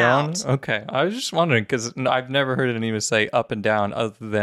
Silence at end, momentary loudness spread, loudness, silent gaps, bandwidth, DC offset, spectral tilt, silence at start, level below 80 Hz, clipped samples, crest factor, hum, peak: 0 s; 4 LU; -22 LUFS; none; 14 kHz; under 0.1%; -4.5 dB/octave; 0 s; -62 dBFS; under 0.1%; 18 dB; none; -4 dBFS